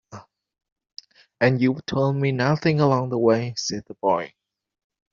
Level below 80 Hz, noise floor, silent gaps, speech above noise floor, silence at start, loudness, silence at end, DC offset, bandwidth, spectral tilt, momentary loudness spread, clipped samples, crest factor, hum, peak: -60 dBFS; -45 dBFS; 0.72-0.76 s; 24 dB; 0.1 s; -22 LUFS; 0.85 s; under 0.1%; 7.4 kHz; -5.5 dB/octave; 8 LU; under 0.1%; 18 dB; none; -4 dBFS